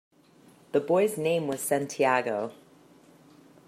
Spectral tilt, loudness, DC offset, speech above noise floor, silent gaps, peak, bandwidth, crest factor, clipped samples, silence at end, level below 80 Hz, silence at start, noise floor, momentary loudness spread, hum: -4.5 dB/octave; -27 LUFS; under 0.1%; 31 dB; none; -10 dBFS; 15.5 kHz; 20 dB; under 0.1%; 1.15 s; -76 dBFS; 0.75 s; -58 dBFS; 7 LU; none